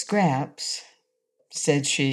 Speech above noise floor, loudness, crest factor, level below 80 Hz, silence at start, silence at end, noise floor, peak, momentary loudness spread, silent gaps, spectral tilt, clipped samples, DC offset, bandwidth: 48 dB; -25 LUFS; 18 dB; -76 dBFS; 0 s; 0 s; -72 dBFS; -8 dBFS; 11 LU; none; -4 dB/octave; under 0.1%; under 0.1%; 13 kHz